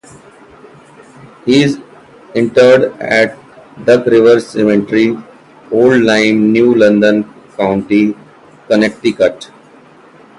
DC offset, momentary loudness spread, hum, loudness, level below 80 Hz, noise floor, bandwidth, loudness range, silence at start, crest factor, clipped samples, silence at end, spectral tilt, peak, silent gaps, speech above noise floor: under 0.1%; 10 LU; none; -11 LUFS; -52 dBFS; -41 dBFS; 11.5 kHz; 3 LU; 1.45 s; 12 dB; under 0.1%; 0.95 s; -6 dB/octave; 0 dBFS; none; 31 dB